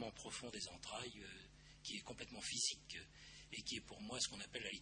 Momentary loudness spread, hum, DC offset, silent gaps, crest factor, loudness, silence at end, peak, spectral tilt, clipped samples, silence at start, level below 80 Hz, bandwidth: 15 LU; none; under 0.1%; none; 22 dB; -47 LUFS; 0 s; -28 dBFS; -1.5 dB/octave; under 0.1%; 0 s; -70 dBFS; 10.5 kHz